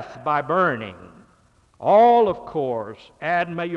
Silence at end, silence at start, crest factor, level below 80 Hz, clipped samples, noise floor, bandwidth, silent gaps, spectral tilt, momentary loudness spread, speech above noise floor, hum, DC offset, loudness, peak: 0 s; 0 s; 14 dB; -60 dBFS; under 0.1%; -58 dBFS; 6.8 kHz; none; -7.5 dB/octave; 16 LU; 38 dB; none; under 0.1%; -20 LUFS; -6 dBFS